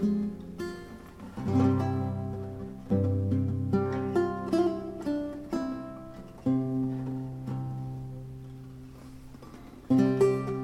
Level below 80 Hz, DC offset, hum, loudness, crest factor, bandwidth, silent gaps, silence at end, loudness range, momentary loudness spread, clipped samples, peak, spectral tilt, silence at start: -54 dBFS; under 0.1%; none; -30 LUFS; 18 dB; 13 kHz; none; 0 s; 5 LU; 20 LU; under 0.1%; -12 dBFS; -9 dB/octave; 0 s